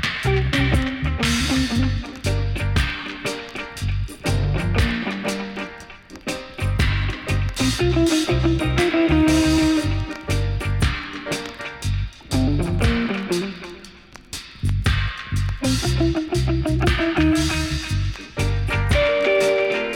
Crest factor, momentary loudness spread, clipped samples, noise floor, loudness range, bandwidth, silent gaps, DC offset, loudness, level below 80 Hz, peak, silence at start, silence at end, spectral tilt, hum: 14 dB; 11 LU; under 0.1%; -43 dBFS; 5 LU; 17 kHz; none; under 0.1%; -21 LUFS; -28 dBFS; -8 dBFS; 0 s; 0 s; -5.5 dB/octave; none